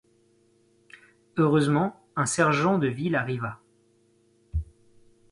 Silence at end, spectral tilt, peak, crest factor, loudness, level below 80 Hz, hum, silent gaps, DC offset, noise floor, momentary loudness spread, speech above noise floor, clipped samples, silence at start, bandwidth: 0.7 s; -5.5 dB/octave; -8 dBFS; 18 dB; -26 LUFS; -46 dBFS; none; none; under 0.1%; -64 dBFS; 13 LU; 40 dB; under 0.1%; 1.35 s; 11.5 kHz